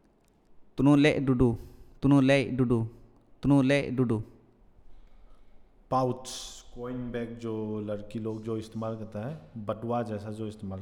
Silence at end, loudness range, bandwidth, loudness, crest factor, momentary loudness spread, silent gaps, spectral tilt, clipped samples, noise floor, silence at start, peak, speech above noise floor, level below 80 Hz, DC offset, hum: 0 s; 10 LU; 11.5 kHz; -28 LUFS; 20 dB; 16 LU; none; -7 dB/octave; under 0.1%; -64 dBFS; 0.55 s; -10 dBFS; 36 dB; -50 dBFS; under 0.1%; none